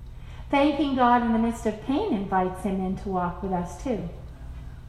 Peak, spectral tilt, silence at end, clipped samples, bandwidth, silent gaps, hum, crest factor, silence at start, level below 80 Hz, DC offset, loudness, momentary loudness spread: -6 dBFS; -6.5 dB/octave; 0 s; under 0.1%; 13 kHz; none; none; 18 dB; 0 s; -42 dBFS; under 0.1%; -25 LUFS; 21 LU